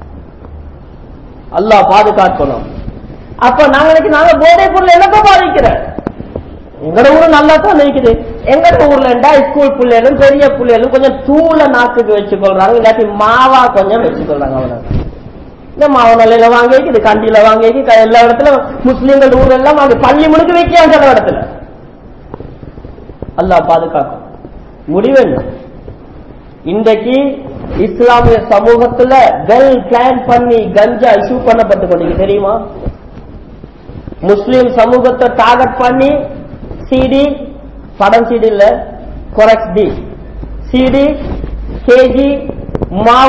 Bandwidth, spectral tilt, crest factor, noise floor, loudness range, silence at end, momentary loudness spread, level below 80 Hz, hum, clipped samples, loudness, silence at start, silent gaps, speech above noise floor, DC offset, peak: 8 kHz; -6.5 dB/octave; 8 dB; -32 dBFS; 6 LU; 0 s; 16 LU; -28 dBFS; none; 6%; -7 LUFS; 0 s; none; 25 dB; 0.7%; 0 dBFS